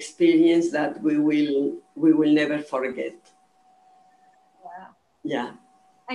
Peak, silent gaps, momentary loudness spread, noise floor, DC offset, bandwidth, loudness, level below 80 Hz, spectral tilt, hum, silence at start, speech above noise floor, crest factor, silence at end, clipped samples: -8 dBFS; none; 18 LU; -60 dBFS; under 0.1%; 10.5 kHz; -22 LUFS; -76 dBFS; -5.5 dB/octave; none; 0 s; 38 dB; 16 dB; 0 s; under 0.1%